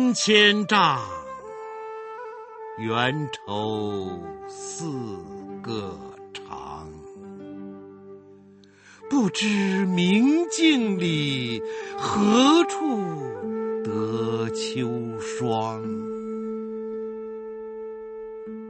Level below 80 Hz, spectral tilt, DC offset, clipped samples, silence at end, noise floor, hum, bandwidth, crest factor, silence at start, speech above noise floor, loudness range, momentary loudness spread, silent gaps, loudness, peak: -62 dBFS; -4.5 dB/octave; under 0.1%; under 0.1%; 0 s; -51 dBFS; none; 8.8 kHz; 22 dB; 0 s; 28 dB; 13 LU; 20 LU; none; -24 LUFS; -4 dBFS